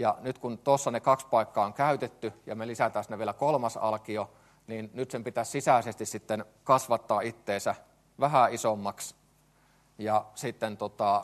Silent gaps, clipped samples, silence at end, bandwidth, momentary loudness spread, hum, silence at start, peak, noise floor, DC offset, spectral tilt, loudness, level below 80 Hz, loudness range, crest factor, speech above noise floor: none; under 0.1%; 0 s; 13 kHz; 12 LU; none; 0 s; -8 dBFS; -64 dBFS; under 0.1%; -5 dB/octave; -30 LUFS; -72 dBFS; 3 LU; 22 dB; 35 dB